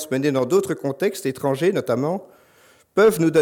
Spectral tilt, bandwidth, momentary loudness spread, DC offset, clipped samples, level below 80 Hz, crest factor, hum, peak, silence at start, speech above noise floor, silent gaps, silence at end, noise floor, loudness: -6 dB/octave; 17.5 kHz; 9 LU; under 0.1%; under 0.1%; -64 dBFS; 14 dB; none; -6 dBFS; 0 s; 35 dB; none; 0 s; -55 dBFS; -21 LUFS